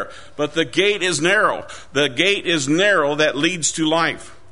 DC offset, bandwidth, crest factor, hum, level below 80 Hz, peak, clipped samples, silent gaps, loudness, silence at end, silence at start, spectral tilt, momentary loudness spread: 1%; 11 kHz; 18 dB; none; -54 dBFS; -2 dBFS; under 0.1%; none; -18 LUFS; 0.2 s; 0 s; -3 dB/octave; 9 LU